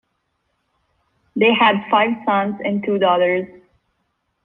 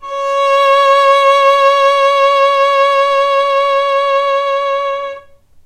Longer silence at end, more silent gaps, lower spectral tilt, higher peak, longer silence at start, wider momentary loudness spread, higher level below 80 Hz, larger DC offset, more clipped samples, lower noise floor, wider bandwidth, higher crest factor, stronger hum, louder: first, 1 s vs 0.45 s; neither; first, -8 dB/octave vs 0.5 dB/octave; about the same, -2 dBFS vs 0 dBFS; first, 1.35 s vs 0 s; about the same, 9 LU vs 7 LU; second, -64 dBFS vs -54 dBFS; neither; neither; first, -71 dBFS vs -38 dBFS; second, 4.2 kHz vs 10 kHz; first, 18 dB vs 10 dB; neither; second, -17 LUFS vs -11 LUFS